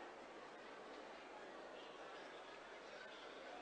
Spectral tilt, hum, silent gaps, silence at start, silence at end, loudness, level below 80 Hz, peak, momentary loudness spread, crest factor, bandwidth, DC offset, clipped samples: -3 dB/octave; none; none; 0 s; 0 s; -56 LUFS; -86 dBFS; -44 dBFS; 2 LU; 12 dB; 9.6 kHz; under 0.1%; under 0.1%